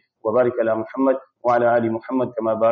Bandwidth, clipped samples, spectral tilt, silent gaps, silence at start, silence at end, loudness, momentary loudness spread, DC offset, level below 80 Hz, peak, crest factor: 6.2 kHz; under 0.1%; -6.5 dB/octave; none; 0.25 s; 0 s; -21 LUFS; 6 LU; under 0.1%; -66 dBFS; -6 dBFS; 14 dB